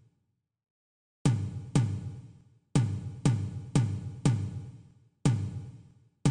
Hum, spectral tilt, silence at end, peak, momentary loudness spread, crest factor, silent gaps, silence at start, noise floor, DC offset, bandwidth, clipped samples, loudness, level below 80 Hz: none; -6.5 dB/octave; 0 s; -12 dBFS; 14 LU; 20 dB; none; 1.25 s; -79 dBFS; under 0.1%; 11 kHz; under 0.1%; -31 LUFS; -52 dBFS